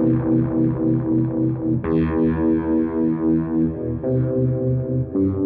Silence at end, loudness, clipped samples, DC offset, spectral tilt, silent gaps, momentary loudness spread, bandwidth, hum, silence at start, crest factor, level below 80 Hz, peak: 0 s; -20 LUFS; under 0.1%; under 0.1%; -13.5 dB/octave; none; 4 LU; 3.5 kHz; none; 0 s; 10 dB; -40 dBFS; -8 dBFS